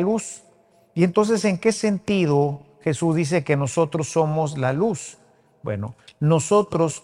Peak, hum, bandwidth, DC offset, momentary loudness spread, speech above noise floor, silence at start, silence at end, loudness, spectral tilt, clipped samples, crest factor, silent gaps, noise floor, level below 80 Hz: -4 dBFS; none; 11.5 kHz; under 0.1%; 12 LU; 36 dB; 0 s; 0.05 s; -22 LUFS; -6 dB/octave; under 0.1%; 18 dB; none; -57 dBFS; -60 dBFS